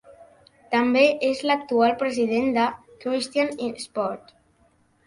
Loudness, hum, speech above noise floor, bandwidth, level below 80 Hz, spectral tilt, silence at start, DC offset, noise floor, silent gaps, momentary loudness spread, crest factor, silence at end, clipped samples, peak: -23 LUFS; none; 40 dB; 11.5 kHz; -64 dBFS; -4 dB/octave; 0.1 s; under 0.1%; -62 dBFS; none; 11 LU; 18 dB; 0.9 s; under 0.1%; -6 dBFS